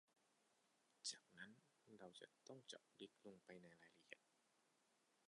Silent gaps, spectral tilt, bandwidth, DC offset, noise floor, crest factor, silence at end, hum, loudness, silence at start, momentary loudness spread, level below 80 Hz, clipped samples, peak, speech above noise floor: none; -2 dB/octave; 11 kHz; under 0.1%; -84 dBFS; 26 dB; 0 s; none; -60 LUFS; 0.1 s; 12 LU; under -90 dBFS; under 0.1%; -38 dBFS; 20 dB